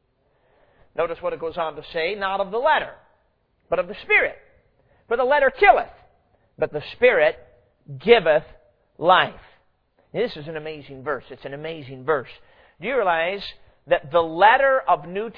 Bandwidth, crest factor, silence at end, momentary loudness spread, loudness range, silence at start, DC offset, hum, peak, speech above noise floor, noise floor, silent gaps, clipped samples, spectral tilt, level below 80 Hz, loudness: 5.2 kHz; 22 dB; 0.05 s; 18 LU; 7 LU; 1 s; under 0.1%; none; 0 dBFS; 45 dB; -66 dBFS; none; under 0.1%; -7 dB/octave; -52 dBFS; -21 LUFS